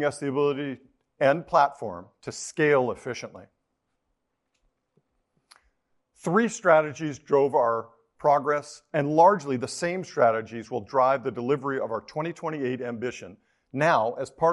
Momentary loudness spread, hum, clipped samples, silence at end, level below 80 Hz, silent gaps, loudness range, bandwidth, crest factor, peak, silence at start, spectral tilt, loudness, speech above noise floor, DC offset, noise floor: 14 LU; none; under 0.1%; 0 s; -68 dBFS; none; 7 LU; 11.5 kHz; 22 dB; -4 dBFS; 0 s; -5.5 dB/octave; -25 LUFS; 53 dB; under 0.1%; -78 dBFS